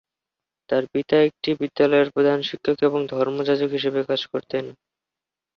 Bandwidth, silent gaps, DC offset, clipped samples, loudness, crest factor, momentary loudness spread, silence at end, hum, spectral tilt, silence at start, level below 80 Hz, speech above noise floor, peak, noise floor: 6.6 kHz; none; under 0.1%; under 0.1%; -22 LUFS; 16 dB; 8 LU; 0.85 s; none; -7 dB/octave; 0.7 s; -66 dBFS; 67 dB; -6 dBFS; -88 dBFS